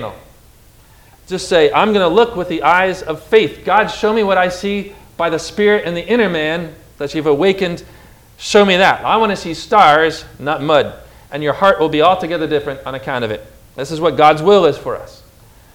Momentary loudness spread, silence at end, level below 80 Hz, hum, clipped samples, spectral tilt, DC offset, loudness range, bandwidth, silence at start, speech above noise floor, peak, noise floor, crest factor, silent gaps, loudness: 14 LU; 0.65 s; -44 dBFS; none; 0.2%; -5 dB/octave; under 0.1%; 3 LU; 17 kHz; 0 s; 31 dB; 0 dBFS; -45 dBFS; 14 dB; none; -14 LUFS